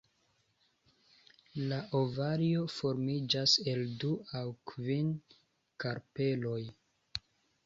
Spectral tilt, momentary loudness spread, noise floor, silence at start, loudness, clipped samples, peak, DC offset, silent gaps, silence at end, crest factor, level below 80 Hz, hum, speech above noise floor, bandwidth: -5.5 dB/octave; 15 LU; -75 dBFS; 1.55 s; -34 LUFS; under 0.1%; -14 dBFS; under 0.1%; none; 0.5 s; 22 dB; -70 dBFS; none; 41 dB; 7.8 kHz